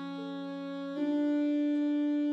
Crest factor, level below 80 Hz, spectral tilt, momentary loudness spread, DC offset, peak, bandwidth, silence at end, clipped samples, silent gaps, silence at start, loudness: 8 dB; under -90 dBFS; -7 dB/octave; 9 LU; under 0.1%; -22 dBFS; 5.8 kHz; 0 s; under 0.1%; none; 0 s; -32 LUFS